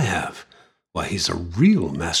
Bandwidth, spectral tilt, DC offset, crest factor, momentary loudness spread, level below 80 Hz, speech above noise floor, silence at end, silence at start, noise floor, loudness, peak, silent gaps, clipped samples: 13.5 kHz; -4.5 dB/octave; under 0.1%; 16 dB; 15 LU; -44 dBFS; 35 dB; 0 s; 0 s; -55 dBFS; -22 LUFS; -6 dBFS; none; under 0.1%